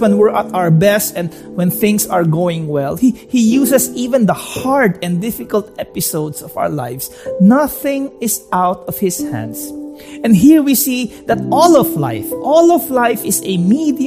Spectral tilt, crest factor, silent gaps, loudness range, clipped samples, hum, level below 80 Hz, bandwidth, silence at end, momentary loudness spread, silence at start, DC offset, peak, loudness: -5.5 dB/octave; 14 dB; none; 5 LU; under 0.1%; none; -48 dBFS; 15.5 kHz; 0 s; 12 LU; 0 s; under 0.1%; 0 dBFS; -14 LUFS